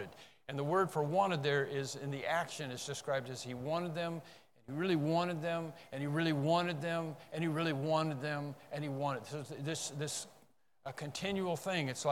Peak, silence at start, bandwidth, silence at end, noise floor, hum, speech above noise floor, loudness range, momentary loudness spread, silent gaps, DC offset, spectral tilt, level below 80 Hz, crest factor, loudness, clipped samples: -18 dBFS; 0 s; 16.5 kHz; 0 s; -69 dBFS; none; 33 dB; 4 LU; 11 LU; none; under 0.1%; -5 dB/octave; -76 dBFS; 18 dB; -37 LUFS; under 0.1%